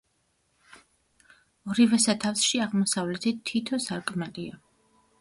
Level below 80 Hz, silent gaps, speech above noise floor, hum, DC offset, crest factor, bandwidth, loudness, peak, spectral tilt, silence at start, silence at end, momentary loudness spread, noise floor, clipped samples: -68 dBFS; none; 46 dB; none; under 0.1%; 18 dB; 11.5 kHz; -26 LUFS; -10 dBFS; -3.5 dB/octave; 1.65 s; 0.65 s; 14 LU; -72 dBFS; under 0.1%